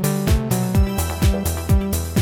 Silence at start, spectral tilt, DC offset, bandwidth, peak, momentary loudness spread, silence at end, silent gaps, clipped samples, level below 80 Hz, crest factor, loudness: 0 s; -6 dB/octave; under 0.1%; 17.5 kHz; -6 dBFS; 2 LU; 0 s; none; under 0.1%; -24 dBFS; 12 dB; -20 LUFS